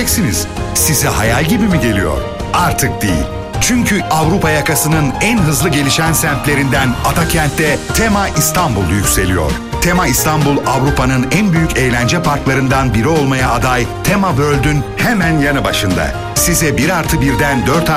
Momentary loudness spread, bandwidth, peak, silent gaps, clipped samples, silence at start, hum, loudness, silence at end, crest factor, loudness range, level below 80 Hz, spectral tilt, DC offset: 4 LU; 16 kHz; 0 dBFS; none; under 0.1%; 0 s; none; -13 LUFS; 0 s; 12 dB; 1 LU; -26 dBFS; -4.5 dB/octave; under 0.1%